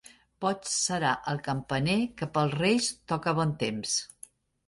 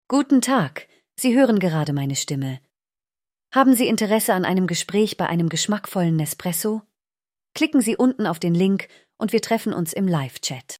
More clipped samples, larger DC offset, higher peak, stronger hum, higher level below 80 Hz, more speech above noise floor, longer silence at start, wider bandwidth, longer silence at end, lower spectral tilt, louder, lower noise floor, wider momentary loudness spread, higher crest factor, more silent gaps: neither; neither; second, -12 dBFS vs -4 dBFS; neither; about the same, -60 dBFS vs -64 dBFS; second, 25 dB vs over 70 dB; first, 0.4 s vs 0.1 s; second, 11.5 kHz vs 16 kHz; first, 0.6 s vs 0.05 s; about the same, -4 dB/octave vs -5 dB/octave; second, -29 LUFS vs -21 LUFS; second, -54 dBFS vs under -90 dBFS; second, 6 LU vs 10 LU; about the same, 18 dB vs 18 dB; neither